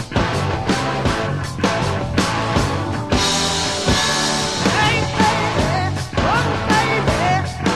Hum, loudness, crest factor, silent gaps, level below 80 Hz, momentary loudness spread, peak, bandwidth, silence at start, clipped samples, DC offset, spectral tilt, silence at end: none; -18 LUFS; 16 dB; none; -32 dBFS; 5 LU; -2 dBFS; 13 kHz; 0 s; under 0.1%; 0.6%; -4 dB/octave; 0 s